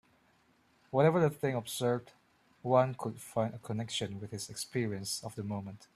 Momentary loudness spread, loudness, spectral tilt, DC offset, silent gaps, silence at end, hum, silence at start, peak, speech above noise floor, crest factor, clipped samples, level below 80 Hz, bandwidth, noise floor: 12 LU; -34 LUFS; -5.5 dB/octave; under 0.1%; none; 0.2 s; none; 0.9 s; -12 dBFS; 36 dB; 22 dB; under 0.1%; -72 dBFS; 14.5 kHz; -69 dBFS